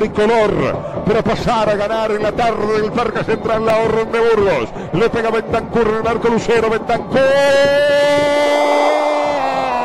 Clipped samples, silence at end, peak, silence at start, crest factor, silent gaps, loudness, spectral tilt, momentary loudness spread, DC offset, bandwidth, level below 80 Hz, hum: under 0.1%; 0 s; -4 dBFS; 0 s; 10 dB; none; -15 LUFS; -5.5 dB/octave; 6 LU; under 0.1%; 13 kHz; -38 dBFS; none